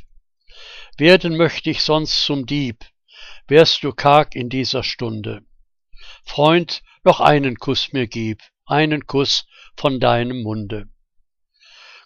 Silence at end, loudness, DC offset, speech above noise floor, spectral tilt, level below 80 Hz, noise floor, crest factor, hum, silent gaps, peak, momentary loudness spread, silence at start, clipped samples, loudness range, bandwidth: 1.2 s; -17 LUFS; under 0.1%; 44 dB; -5.5 dB/octave; -44 dBFS; -62 dBFS; 18 dB; none; none; 0 dBFS; 16 LU; 0 s; under 0.1%; 4 LU; 11 kHz